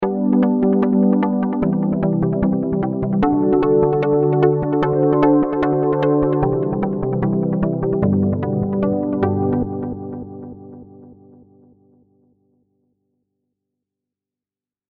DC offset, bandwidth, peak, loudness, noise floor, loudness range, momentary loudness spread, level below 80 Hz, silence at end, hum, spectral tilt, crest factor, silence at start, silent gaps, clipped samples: under 0.1%; 4.6 kHz; -2 dBFS; -18 LUFS; under -90 dBFS; 9 LU; 6 LU; -42 dBFS; 3.75 s; none; -11.5 dB/octave; 16 dB; 0 s; none; under 0.1%